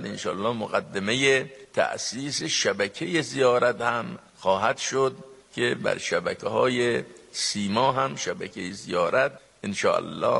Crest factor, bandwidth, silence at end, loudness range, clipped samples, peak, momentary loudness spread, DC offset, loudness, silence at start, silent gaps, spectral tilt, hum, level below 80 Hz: 20 dB; 11.5 kHz; 0 s; 2 LU; under 0.1%; -6 dBFS; 9 LU; under 0.1%; -25 LUFS; 0 s; none; -3.5 dB/octave; none; -66 dBFS